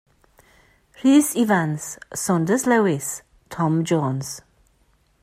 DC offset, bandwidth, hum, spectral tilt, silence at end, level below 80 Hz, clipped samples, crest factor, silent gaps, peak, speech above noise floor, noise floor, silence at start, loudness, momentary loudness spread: under 0.1%; 16 kHz; none; -5.5 dB/octave; 0.85 s; -60 dBFS; under 0.1%; 16 dB; none; -6 dBFS; 42 dB; -62 dBFS; 1 s; -21 LUFS; 15 LU